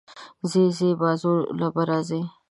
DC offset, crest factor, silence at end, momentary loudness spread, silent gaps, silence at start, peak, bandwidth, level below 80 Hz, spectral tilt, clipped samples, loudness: under 0.1%; 16 dB; 0.2 s; 8 LU; none; 0.1 s; -8 dBFS; 11.5 kHz; -68 dBFS; -7 dB/octave; under 0.1%; -23 LUFS